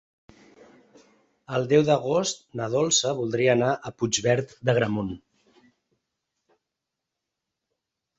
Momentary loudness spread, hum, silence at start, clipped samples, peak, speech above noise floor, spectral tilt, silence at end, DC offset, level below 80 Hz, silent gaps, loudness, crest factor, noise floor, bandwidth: 9 LU; none; 1.5 s; under 0.1%; -6 dBFS; 61 dB; -4 dB/octave; 3 s; under 0.1%; -62 dBFS; none; -24 LUFS; 20 dB; -85 dBFS; 8.4 kHz